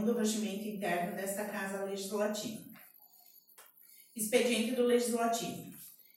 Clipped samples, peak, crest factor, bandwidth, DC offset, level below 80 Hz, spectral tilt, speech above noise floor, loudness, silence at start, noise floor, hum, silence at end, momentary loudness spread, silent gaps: under 0.1%; -16 dBFS; 20 dB; 16.5 kHz; under 0.1%; -82 dBFS; -3.5 dB/octave; 28 dB; -34 LUFS; 0 s; -62 dBFS; none; 0.15 s; 19 LU; none